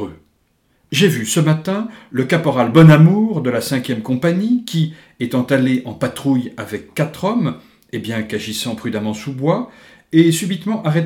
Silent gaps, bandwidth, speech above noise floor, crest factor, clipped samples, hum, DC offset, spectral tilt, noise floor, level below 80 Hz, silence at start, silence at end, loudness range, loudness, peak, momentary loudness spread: none; 16 kHz; 45 dB; 16 dB; under 0.1%; none; under 0.1%; -6 dB/octave; -61 dBFS; -54 dBFS; 0 s; 0 s; 8 LU; -17 LUFS; 0 dBFS; 12 LU